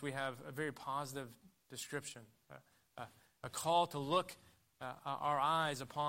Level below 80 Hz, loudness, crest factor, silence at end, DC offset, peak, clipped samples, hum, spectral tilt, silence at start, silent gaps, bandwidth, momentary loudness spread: -78 dBFS; -39 LUFS; 20 dB; 0 s; under 0.1%; -20 dBFS; under 0.1%; none; -4 dB/octave; 0 s; none; 16 kHz; 23 LU